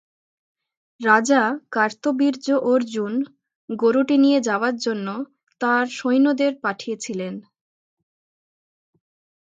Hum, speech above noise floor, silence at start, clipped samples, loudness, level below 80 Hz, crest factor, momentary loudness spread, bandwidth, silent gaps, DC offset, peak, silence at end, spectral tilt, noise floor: none; over 70 dB; 1 s; under 0.1%; -21 LUFS; -76 dBFS; 20 dB; 13 LU; 9 kHz; 3.56-3.68 s; under 0.1%; -2 dBFS; 2.2 s; -4.5 dB/octave; under -90 dBFS